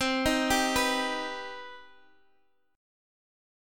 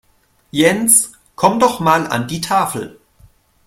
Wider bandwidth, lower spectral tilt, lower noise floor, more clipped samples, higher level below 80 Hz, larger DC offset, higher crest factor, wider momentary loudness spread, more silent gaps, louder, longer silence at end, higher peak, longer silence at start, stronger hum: about the same, 17.5 kHz vs 16.5 kHz; about the same, -2.5 dB/octave vs -3 dB/octave; first, -71 dBFS vs -57 dBFS; neither; about the same, -50 dBFS vs -52 dBFS; neither; about the same, 20 dB vs 18 dB; first, 17 LU vs 14 LU; neither; second, -27 LUFS vs -15 LUFS; first, 1.9 s vs 0.75 s; second, -12 dBFS vs 0 dBFS; second, 0 s vs 0.55 s; neither